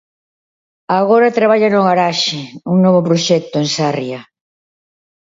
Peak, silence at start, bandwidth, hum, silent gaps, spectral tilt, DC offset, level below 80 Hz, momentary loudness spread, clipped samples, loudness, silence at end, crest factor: 0 dBFS; 0.9 s; 7.8 kHz; none; none; -5 dB/octave; under 0.1%; -62 dBFS; 9 LU; under 0.1%; -13 LUFS; 1 s; 14 dB